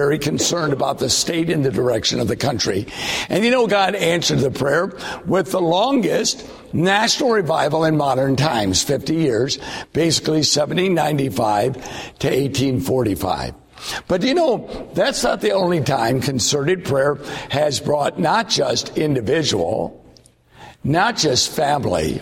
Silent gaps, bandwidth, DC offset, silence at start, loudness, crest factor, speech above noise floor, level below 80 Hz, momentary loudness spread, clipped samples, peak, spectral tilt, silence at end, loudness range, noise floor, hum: none; 16.5 kHz; under 0.1%; 0 s; -18 LUFS; 16 dB; 31 dB; -46 dBFS; 7 LU; under 0.1%; -4 dBFS; -4 dB/octave; 0 s; 2 LU; -49 dBFS; none